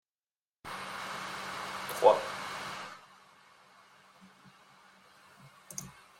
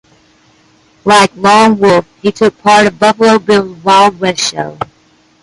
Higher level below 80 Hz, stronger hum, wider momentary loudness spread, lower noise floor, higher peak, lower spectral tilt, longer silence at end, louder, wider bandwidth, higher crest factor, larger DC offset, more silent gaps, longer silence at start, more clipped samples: second, -74 dBFS vs -48 dBFS; neither; first, 19 LU vs 12 LU; first, under -90 dBFS vs -49 dBFS; second, -8 dBFS vs 0 dBFS; second, -2.5 dB/octave vs -4 dB/octave; second, 0.2 s vs 0.6 s; second, -33 LUFS vs -9 LUFS; first, 16.5 kHz vs 11.5 kHz; first, 28 dB vs 10 dB; neither; neither; second, 0.65 s vs 1.05 s; neither